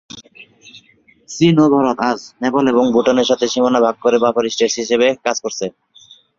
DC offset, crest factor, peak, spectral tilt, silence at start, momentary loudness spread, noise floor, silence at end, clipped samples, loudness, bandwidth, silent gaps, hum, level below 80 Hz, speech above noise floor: under 0.1%; 16 dB; 0 dBFS; -5 dB/octave; 0.15 s; 11 LU; -52 dBFS; 0.7 s; under 0.1%; -15 LUFS; 7.6 kHz; none; none; -56 dBFS; 37 dB